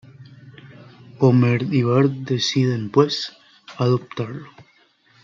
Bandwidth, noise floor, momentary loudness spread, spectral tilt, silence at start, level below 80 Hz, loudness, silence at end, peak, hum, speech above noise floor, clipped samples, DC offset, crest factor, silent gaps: 7.4 kHz; -58 dBFS; 14 LU; -6.5 dB/octave; 0.2 s; -66 dBFS; -20 LUFS; 0.6 s; -4 dBFS; none; 39 dB; under 0.1%; under 0.1%; 18 dB; none